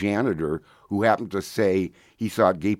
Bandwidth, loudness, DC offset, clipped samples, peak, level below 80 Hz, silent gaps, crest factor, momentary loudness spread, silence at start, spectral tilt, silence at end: 16.5 kHz; -25 LUFS; under 0.1%; under 0.1%; -4 dBFS; -56 dBFS; none; 20 dB; 10 LU; 0 s; -6.5 dB/octave; 0.05 s